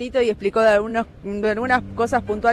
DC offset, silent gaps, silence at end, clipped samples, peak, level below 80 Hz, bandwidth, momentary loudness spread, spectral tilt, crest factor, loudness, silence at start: under 0.1%; none; 0 s; under 0.1%; -6 dBFS; -44 dBFS; 12.5 kHz; 8 LU; -5.5 dB/octave; 14 dB; -20 LUFS; 0 s